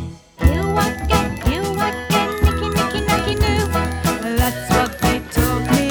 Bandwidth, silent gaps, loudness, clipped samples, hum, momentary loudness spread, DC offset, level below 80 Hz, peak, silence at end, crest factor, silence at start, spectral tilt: over 20 kHz; none; -19 LUFS; under 0.1%; none; 3 LU; under 0.1%; -24 dBFS; -2 dBFS; 0 s; 18 dB; 0 s; -5 dB/octave